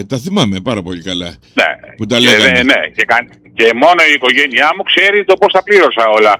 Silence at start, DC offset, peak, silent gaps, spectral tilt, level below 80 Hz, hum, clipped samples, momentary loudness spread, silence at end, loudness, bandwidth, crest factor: 0 s; under 0.1%; 0 dBFS; none; -4 dB/octave; -48 dBFS; none; under 0.1%; 12 LU; 0 s; -10 LUFS; 17.5 kHz; 10 dB